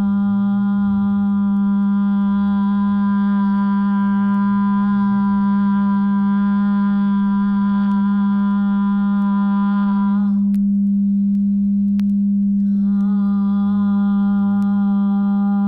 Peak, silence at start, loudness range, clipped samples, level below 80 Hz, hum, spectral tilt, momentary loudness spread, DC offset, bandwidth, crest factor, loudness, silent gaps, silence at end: -10 dBFS; 0 s; 0 LU; under 0.1%; -50 dBFS; none; -10.5 dB/octave; 1 LU; under 0.1%; 3.8 kHz; 6 dB; -17 LUFS; none; 0 s